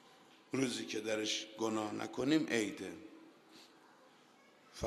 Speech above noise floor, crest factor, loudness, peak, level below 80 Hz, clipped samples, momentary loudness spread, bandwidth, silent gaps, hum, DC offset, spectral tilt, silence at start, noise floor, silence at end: 28 dB; 20 dB; -37 LUFS; -20 dBFS; -80 dBFS; under 0.1%; 25 LU; 13 kHz; none; none; under 0.1%; -3.5 dB/octave; 0.05 s; -65 dBFS; 0 s